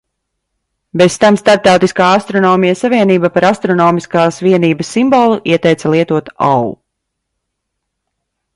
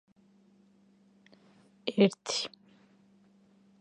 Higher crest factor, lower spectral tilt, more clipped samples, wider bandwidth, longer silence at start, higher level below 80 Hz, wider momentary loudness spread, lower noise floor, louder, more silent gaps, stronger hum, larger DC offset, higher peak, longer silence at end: second, 12 dB vs 26 dB; about the same, -5.5 dB/octave vs -4.5 dB/octave; neither; about the same, 11.5 kHz vs 10.5 kHz; second, 0.95 s vs 1.85 s; first, -52 dBFS vs -84 dBFS; second, 5 LU vs 13 LU; first, -73 dBFS vs -64 dBFS; first, -11 LUFS vs -30 LUFS; neither; neither; neither; first, 0 dBFS vs -10 dBFS; first, 1.8 s vs 1.35 s